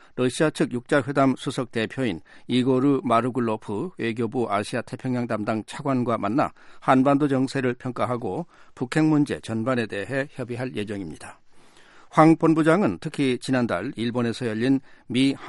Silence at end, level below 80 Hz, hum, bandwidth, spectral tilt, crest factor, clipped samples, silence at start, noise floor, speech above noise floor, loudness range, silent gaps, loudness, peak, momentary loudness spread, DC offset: 0 s; -60 dBFS; none; 11.5 kHz; -6.5 dB/octave; 22 dB; under 0.1%; 0.15 s; -50 dBFS; 26 dB; 4 LU; none; -24 LUFS; -2 dBFS; 11 LU; under 0.1%